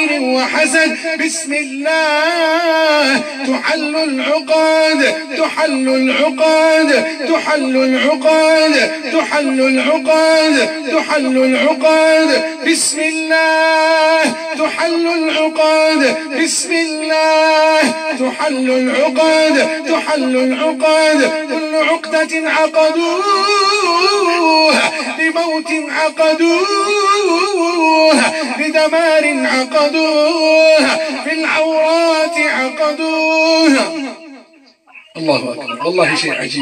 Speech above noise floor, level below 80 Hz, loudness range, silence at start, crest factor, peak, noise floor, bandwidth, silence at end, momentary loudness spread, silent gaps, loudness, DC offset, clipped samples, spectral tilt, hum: 34 dB; -74 dBFS; 2 LU; 0 s; 12 dB; 0 dBFS; -46 dBFS; 14 kHz; 0 s; 6 LU; none; -13 LUFS; under 0.1%; under 0.1%; -2 dB/octave; none